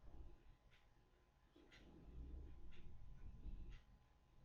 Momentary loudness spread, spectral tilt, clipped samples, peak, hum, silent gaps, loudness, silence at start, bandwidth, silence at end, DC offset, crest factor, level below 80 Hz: 8 LU; -6.5 dB/octave; under 0.1%; -42 dBFS; none; none; -63 LUFS; 0 s; 6.8 kHz; 0 s; under 0.1%; 14 dB; -60 dBFS